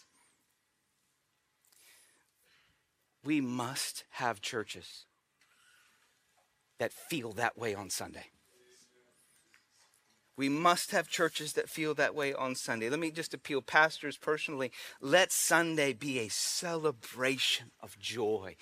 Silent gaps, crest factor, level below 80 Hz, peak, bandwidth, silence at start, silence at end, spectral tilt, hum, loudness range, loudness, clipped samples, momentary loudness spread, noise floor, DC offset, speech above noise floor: none; 26 dB; -82 dBFS; -10 dBFS; 15.5 kHz; 3.25 s; 0.1 s; -2.5 dB/octave; none; 11 LU; -33 LUFS; under 0.1%; 12 LU; -78 dBFS; under 0.1%; 45 dB